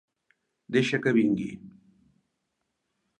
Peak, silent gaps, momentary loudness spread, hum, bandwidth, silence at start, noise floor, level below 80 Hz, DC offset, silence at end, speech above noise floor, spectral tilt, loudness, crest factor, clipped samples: -12 dBFS; none; 14 LU; none; 9.8 kHz; 0.7 s; -80 dBFS; -68 dBFS; under 0.1%; 1.5 s; 55 dB; -6 dB/octave; -26 LUFS; 20 dB; under 0.1%